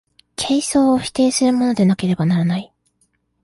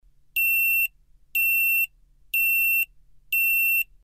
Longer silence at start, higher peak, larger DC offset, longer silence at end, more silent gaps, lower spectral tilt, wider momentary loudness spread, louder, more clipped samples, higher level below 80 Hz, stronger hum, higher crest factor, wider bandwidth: about the same, 0.4 s vs 0.35 s; first, -4 dBFS vs -14 dBFS; neither; first, 0.8 s vs 0.2 s; neither; first, -5.5 dB/octave vs 4 dB/octave; about the same, 8 LU vs 9 LU; first, -17 LUFS vs -21 LUFS; neither; first, -52 dBFS vs -58 dBFS; first, 60 Hz at -45 dBFS vs none; about the same, 12 dB vs 10 dB; second, 11.5 kHz vs 15.5 kHz